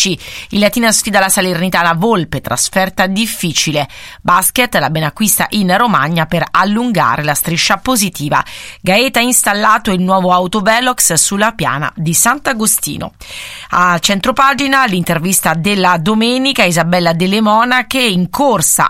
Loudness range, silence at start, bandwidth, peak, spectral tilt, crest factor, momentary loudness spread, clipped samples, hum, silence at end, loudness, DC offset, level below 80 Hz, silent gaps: 2 LU; 0 s; 18 kHz; 0 dBFS; -3 dB/octave; 12 dB; 6 LU; 0.3%; none; 0 s; -12 LUFS; under 0.1%; -42 dBFS; none